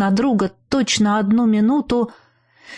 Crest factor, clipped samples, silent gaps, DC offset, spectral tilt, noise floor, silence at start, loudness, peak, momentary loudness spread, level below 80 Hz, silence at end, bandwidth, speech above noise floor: 12 dB; under 0.1%; none; under 0.1%; -5 dB/octave; -47 dBFS; 0 s; -18 LUFS; -6 dBFS; 6 LU; -48 dBFS; 0 s; 10.5 kHz; 30 dB